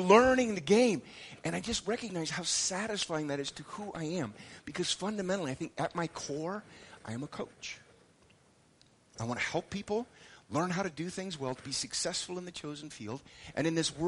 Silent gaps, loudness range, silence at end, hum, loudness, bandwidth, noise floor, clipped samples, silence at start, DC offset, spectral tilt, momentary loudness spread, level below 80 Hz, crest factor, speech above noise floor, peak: none; 9 LU; 0 s; none; -34 LUFS; 11.5 kHz; -65 dBFS; under 0.1%; 0 s; under 0.1%; -4 dB/octave; 15 LU; -62 dBFS; 26 dB; 32 dB; -8 dBFS